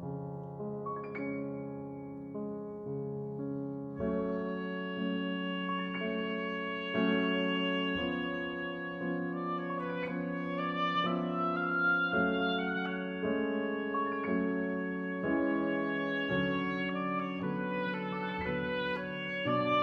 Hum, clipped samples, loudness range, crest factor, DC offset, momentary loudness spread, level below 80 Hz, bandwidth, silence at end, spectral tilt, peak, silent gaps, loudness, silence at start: none; under 0.1%; 6 LU; 16 dB; under 0.1%; 9 LU; -62 dBFS; 6.4 kHz; 0 s; -8 dB/octave; -18 dBFS; none; -34 LUFS; 0 s